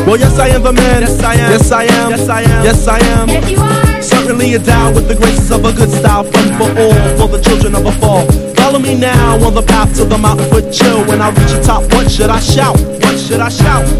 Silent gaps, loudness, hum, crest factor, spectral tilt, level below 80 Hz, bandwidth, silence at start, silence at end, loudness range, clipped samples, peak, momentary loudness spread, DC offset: none; -9 LUFS; none; 8 dB; -5 dB/octave; -14 dBFS; 14.5 kHz; 0 s; 0 s; 1 LU; 1%; 0 dBFS; 3 LU; under 0.1%